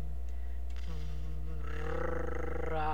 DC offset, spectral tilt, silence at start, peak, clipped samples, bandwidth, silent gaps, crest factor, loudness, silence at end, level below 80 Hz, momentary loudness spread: 2%; -7 dB/octave; 0 s; -22 dBFS; under 0.1%; 7.4 kHz; none; 14 dB; -40 LUFS; 0 s; -40 dBFS; 6 LU